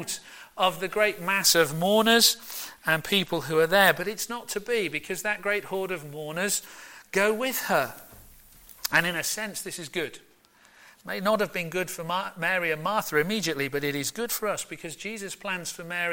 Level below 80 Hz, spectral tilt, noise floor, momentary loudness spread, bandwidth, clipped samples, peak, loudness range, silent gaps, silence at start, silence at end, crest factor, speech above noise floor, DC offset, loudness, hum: -62 dBFS; -2.5 dB/octave; -58 dBFS; 14 LU; 17 kHz; under 0.1%; -4 dBFS; 7 LU; none; 0 s; 0 s; 22 dB; 31 dB; under 0.1%; -26 LUFS; none